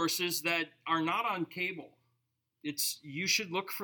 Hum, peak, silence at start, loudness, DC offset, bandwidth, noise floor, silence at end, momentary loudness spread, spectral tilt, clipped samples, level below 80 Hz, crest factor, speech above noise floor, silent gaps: none; -16 dBFS; 0 s; -32 LUFS; under 0.1%; 19 kHz; -81 dBFS; 0 s; 7 LU; -2 dB/octave; under 0.1%; -88 dBFS; 18 dB; 47 dB; none